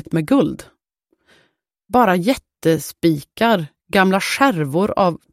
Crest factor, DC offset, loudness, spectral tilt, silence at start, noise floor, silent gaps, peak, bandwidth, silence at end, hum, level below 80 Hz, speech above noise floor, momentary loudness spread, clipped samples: 16 dB; under 0.1%; -18 LUFS; -5.5 dB/octave; 0.1 s; -68 dBFS; none; -2 dBFS; 16 kHz; 0.15 s; none; -52 dBFS; 51 dB; 5 LU; under 0.1%